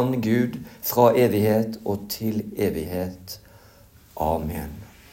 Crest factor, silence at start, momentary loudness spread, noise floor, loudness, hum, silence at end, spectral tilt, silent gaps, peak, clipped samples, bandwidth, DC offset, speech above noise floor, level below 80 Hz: 20 dB; 0 s; 20 LU; -51 dBFS; -24 LUFS; none; 0.25 s; -6.5 dB/octave; none; -4 dBFS; under 0.1%; 16.5 kHz; under 0.1%; 28 dB; -48 dBFS